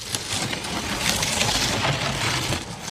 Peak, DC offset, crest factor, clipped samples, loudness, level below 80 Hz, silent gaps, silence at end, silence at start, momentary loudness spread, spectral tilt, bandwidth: -2 dBFS; under 0.1%; 24 dB; under 0.1%; -23 LUFS; -42 dBFS; none; 0 s; 0 s; 6 LU; -2.5 dB/octave; 16.5 kHz